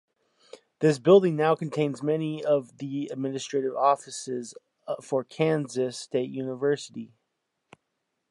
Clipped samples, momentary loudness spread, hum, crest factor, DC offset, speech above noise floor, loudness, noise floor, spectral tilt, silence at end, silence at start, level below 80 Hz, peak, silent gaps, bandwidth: under 0.1%; 16 LU; none; 20 dB; under 0.1%; 54 dB; -26 LUFS; -80 dBFS; -6 dB/octave; 1.25 s; 0.8 s; -78 dBFS; -8 dBFS; none; 11.5 kHz